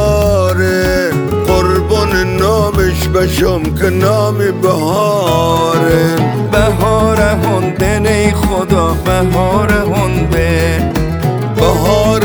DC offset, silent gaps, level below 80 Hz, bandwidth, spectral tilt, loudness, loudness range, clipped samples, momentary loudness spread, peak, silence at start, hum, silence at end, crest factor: under 0.1%; none; -22 dBFS; over 20 kHz; -6 dB/octave; -12 LUFS; 1 LU; under 0.1%; 3 LU; 0 dBFS; 0 s; none; 0 s; 12 dB